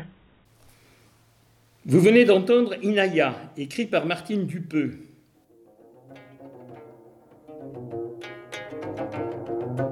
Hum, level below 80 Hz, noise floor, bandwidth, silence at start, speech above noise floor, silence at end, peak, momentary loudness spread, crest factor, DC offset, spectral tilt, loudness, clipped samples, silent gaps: none; -66 dBFS; -60 dBFS; 14.5 kHz; 0 s; 39 dB; 0 s; -6 dBFS; 25 LU; 20 dB; under 0.1%; -6.5 dB/octave; -23 LUFS; under 0.1%; none